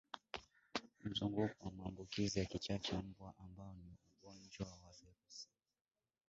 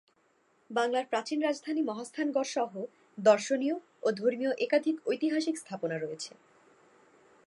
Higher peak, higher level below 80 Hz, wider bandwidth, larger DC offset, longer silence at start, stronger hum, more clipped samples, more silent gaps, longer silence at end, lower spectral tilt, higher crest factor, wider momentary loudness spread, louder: second, -24 dBFS vs -10 dBFS; first, -64 dBFS vs -86 dBFS; second, 7.6 kHz vs 11.5 kHz; neither; second, 0.15 s vs 0.7 s; neither; neither; neither; second, 0.85 s vs 1.2 s; about the same, -4.5 dB/octave vs -4.5 dB/octave; about the same, 24 dB vs 20 dB; first, 20 LU vs 9 LU; second, -45 LUFS vs -31 LUFS